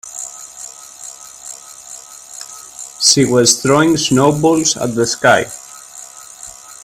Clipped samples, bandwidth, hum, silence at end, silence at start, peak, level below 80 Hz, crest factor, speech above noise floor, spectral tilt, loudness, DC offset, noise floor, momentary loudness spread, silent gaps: under 0.1%; 16 kHz; none; 0.1 s; 0.05 s; 0 dBFS; -52 dBFS; 16 dB; 23 dB; -3 dB/octave; -12 LUFS; under 0.1%; -36 dBFS; 21 LU; none